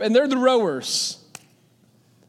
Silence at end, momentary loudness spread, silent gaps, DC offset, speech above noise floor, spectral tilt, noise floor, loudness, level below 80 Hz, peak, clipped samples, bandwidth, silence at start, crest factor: 1.15 s; 9 LU; none; under 0.1%; 38 dB; -3 dB/octave; -58 dBFS; -21 LUFS; -82 dBFS; -4 dBFS; under 0.1%; 15 kHz; 0 s; 18 dB